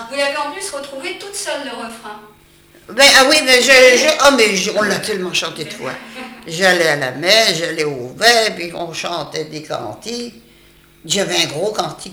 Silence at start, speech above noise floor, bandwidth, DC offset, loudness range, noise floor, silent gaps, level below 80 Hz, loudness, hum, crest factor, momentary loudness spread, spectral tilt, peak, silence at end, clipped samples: 0 s; 32 dB; over 20 kHz; under 0.1%; 10 LU; -48 dBFS; none; -52 dBFS; -13 LUFS; none; 16 dB; 19 LU; -1.5 dB/octave; 0 dBFS; 0 s; under 0.1%